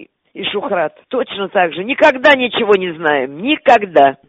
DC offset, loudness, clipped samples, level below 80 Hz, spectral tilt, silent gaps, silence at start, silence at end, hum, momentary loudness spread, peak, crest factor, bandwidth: under 0.1%; -14 LUFS; under 0.1%; -56 dBFS; -5 dB/octave; none; 0 s; 0.15 s; none; 10 LU; 0 dBFS; 14 dB; 8 kHz